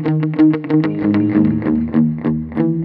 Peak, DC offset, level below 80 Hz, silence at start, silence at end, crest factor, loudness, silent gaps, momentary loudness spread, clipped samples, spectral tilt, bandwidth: -2 dBFS; under 0.1%; -44 dBFS; 0 s; 0 s; 12 dB; -16 LUFS; none; 5 LU; under 0.1%; -11.5 dB/octave; 4.8 kHz